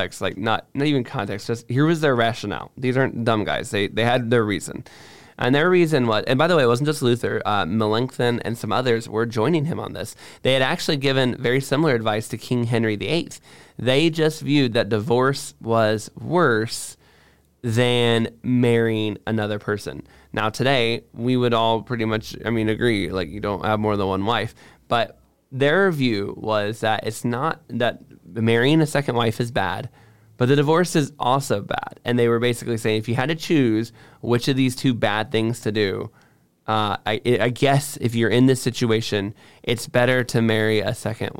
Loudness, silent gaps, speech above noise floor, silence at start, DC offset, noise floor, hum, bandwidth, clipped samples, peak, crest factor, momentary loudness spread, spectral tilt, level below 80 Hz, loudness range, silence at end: -21 LUFS; none; 35 dB; 0 s; 0.6%; -56 dBFS; none; 17 kHz; under 0.1%; -6 dBFS; 14 dB; 9 LU; -5.5 dB/octave; -54 dBFS; 2 LU; 0 s